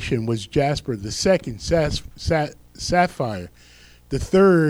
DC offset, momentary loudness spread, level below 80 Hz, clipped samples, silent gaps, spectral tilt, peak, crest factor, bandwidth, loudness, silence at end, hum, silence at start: under 0.1%; 10 LU; -38 dBFS; under 0.1%; none; -5.5 dB/octave; -4 dBFS; 16 dB; 15.5 kHz; -22 LUFS; 0 s; none; 0 s